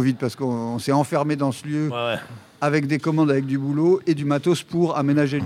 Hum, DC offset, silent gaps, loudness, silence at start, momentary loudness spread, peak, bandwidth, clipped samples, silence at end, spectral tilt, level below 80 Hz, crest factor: none; under 0.1%; none; -22 LUFS; 0 s; 6 LU; -6 dBFS; 14.5 kHz; under 0.1%; 0 s; -7 dB/octave; -66 dBFS; 16 dB